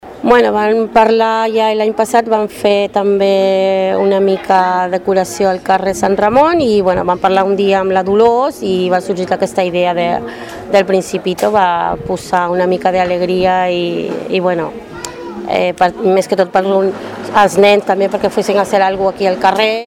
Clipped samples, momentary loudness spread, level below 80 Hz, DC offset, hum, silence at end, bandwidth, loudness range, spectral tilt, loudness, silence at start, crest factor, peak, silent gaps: under 0.1%; 7 LU; -46 dBFS; under 0.1%; none; 0 s; 16 kHz; 3 LU; -5 dB/octave; -13 LUFS; 0.05 s; 12 dB; 0 dBFS; none